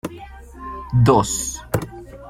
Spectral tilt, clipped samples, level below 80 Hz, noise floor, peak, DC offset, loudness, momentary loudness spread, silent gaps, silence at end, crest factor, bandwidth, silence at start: -5.5 dB/octave; under 0.1%; -38 dBFS; -38 dBFS; -2 dBFS; under 0.1%; -19 LUFS; 22 LU; none; 0 s; 20 dB; 16.5 kHz; 0.05 s